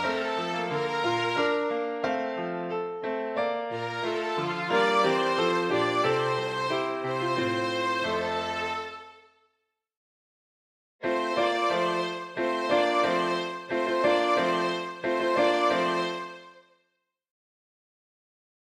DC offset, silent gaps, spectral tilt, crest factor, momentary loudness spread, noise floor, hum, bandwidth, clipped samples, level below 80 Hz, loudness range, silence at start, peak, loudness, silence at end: under 0.1%; 9.97-10.99 s; -4.5 dB/octave; 18 dB; 8 LU; -79 dBFS; none; 13 kHz; under 0.1%; -70 dBFS; 6 LU; 0 s; -10 dBFS; -27 LUFS; 2.05 s